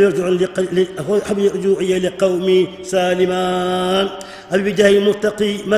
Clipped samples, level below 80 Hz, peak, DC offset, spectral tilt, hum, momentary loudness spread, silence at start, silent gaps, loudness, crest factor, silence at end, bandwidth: under 0.1%; -52 dBFS; 0 dBFS; under 0.1%; -5.5 dB/octave; none; 6 LU; 0 s; none; -17 LUFS; 16 dB; 0 s; 14 kHz